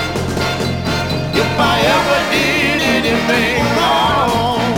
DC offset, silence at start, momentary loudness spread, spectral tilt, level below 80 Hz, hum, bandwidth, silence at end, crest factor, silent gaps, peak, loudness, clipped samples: under 0.1%; 0 s; 5 LU; -4.5 dB/octave; -34 dBFS; none; 18.5 kHz; 0 s; 12 dB; none; -2 dBFS; -14 LUFS; under 0.1%